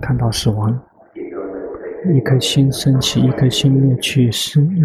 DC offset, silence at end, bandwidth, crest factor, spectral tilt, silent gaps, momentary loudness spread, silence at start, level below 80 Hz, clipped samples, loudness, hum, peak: under 0.1%; 0 s; 14 kHz; 12 dB; -5.5 dB/octave; none; 14 LU; 0 s; -40 dBFS; under 0.1%; -15 LUFS; none; -2 dBFS